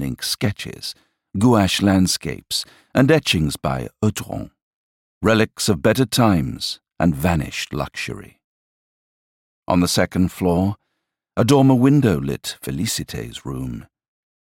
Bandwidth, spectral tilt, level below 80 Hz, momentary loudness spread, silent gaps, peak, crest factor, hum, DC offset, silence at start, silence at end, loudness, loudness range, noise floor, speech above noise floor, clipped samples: 17 kHz; -5 dB/octave; -42 dBFS; 14 LU; 4.62-5.21 s, 8.44-9.62 s; -4 dBFS; 16 dB; none; under 0.1%; 0 s; 0.7 s; -19 LUFS; 5 LU; -77 dBFS; 58 dB; under 0.1%